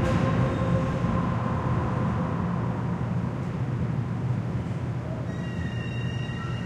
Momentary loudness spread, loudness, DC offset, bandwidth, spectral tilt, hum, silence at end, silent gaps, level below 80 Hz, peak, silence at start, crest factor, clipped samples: 6 LU; -28 LUFS; under 0.1%; 9.2 kHz; -8 dB/octave; none; 0 s; none; -42 dBFS; -12 dBFS; 0 s; 14 dB; under 0.1%